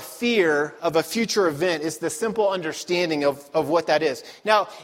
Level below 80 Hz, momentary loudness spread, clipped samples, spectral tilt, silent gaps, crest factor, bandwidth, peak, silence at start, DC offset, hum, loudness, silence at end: -66 dBFS; 6 LU; under 0.1%; -4 dB/octave; none; 18 dB; 16.5 kHz; -4 dBFS; 0 s; under 0.1%; none; -23 LUFS; 0 s